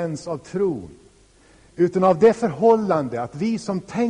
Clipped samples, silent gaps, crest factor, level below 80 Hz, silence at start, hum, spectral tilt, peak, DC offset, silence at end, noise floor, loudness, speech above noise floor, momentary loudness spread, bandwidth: under 0.1%; none; 16 dB; -56 dBFS; 0 s; none; -7 dB/octave; -4 dBFS; under 0.1%; 0 s; -53 dBFS; -20 LUFS; 33 dB; 12 LU; 10.5 kHz